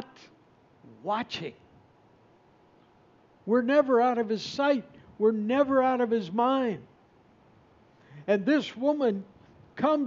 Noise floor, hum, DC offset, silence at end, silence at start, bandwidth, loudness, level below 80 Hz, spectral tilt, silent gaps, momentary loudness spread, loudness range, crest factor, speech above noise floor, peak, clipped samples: -60 dBFS; none; under 0.1%; 0 s; 0 s; 7.6 kHz; -27 LUFS; -72 dBFS; -4 dB/octave; none; 16 LU; 9 LU; 18 dB; 34 dB; -10 dBFS; under 0.1%